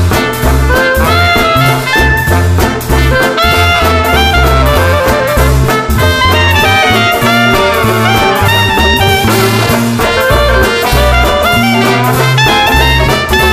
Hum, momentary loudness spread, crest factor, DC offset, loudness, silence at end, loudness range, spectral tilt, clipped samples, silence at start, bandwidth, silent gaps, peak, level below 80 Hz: none; 3 LU; 8 dB; under 0.1%; -8 LUFS; 0 s; 1 LU; -4.5 dB/octave; under 0.1%; 0 s; 16 kHz; none; 0 dBFS; -16 dBFS